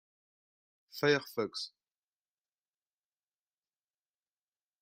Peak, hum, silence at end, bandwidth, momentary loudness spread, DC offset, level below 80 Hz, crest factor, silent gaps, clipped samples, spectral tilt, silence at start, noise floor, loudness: -14 dBFS; none; 3.15 s; 15.5 kHz; 15 LU; under 0.1%; -84 dBFS; 26 dB; none; under 0.1%; -4.5 dB/octave; 0.95 s; under -90 dBFS; -33 LUFS